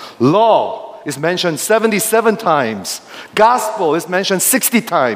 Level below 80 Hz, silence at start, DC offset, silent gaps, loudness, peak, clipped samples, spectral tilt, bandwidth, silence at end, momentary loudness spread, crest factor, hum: -64 dBFS; 0 s; under 0.1%; none; -14 LUFS; 0 dBFS; under 0.1%; -3.5 dB/octave; 16 kHz; 0 s; 11 LU; 14 dB; none